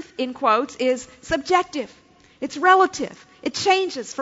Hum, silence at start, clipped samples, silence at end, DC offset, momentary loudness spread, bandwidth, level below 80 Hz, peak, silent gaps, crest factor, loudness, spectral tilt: none; 0 s; under 0.1%; 0 s; under 0.1%; 15 LU; 8 kHz; -56 dBFS; -2 dBFS; none; 20 dB; -21 LUFS; -2.5 dB/octave